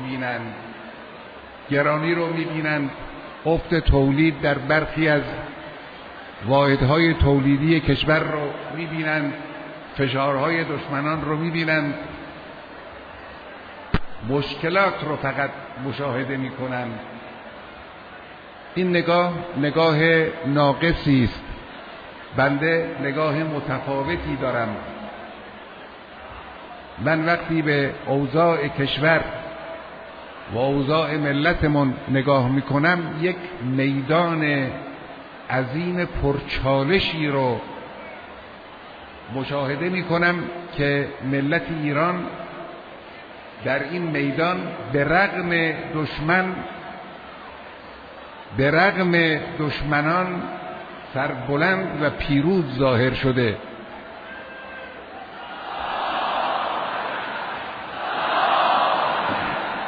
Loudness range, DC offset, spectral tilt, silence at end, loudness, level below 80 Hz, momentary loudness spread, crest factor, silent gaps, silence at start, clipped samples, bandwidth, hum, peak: 6 LU; under 0.1%; -8.5 dB/octave; 0 s; -22 LUFS; -40 dBFS; 20 LU; 18 dB; none; 0 s; under 0.1%; 5 kHz; none; -4 dBFS